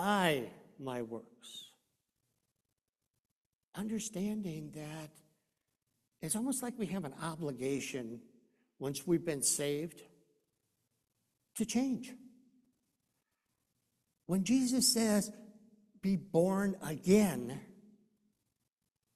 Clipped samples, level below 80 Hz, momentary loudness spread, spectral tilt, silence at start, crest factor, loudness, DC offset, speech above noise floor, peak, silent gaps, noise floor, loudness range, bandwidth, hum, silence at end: under 0.1%; -70 dBFS; 20 LU; -4 dB/octave; 0 s; 22 dB; -34 LUFS; under 0.1%; 54 dB; -16 dBFS; 2.89-2.93 s, 3.10-3.14 s, 3.20-3.25 s, 3.31-3.59 s, 3.68-3.72 s; -88 dBFS; 11 LU; 14.5 kHz; none; 1.45 s